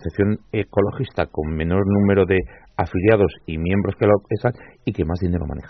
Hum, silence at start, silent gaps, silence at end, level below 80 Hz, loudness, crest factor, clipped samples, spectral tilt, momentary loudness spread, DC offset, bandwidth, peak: none; 0 s; none; 0 s; -40 dBFS; -21 LUFS; 16 dB; under 0.1%; -7.5 dB/octave; 8 LU; under 0.1%; 5.8 kHz; -4 dBFS